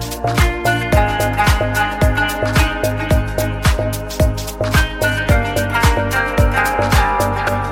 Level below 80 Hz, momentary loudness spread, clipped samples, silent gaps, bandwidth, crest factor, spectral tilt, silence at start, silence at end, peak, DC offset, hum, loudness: -22 dBFS; 4 LU; under 0.1%; none; 17 kHz; 16 dB; -5 dB/octave; 0 s; 0 s; 0 dBFS; under 0.1%; none; -16 LUFS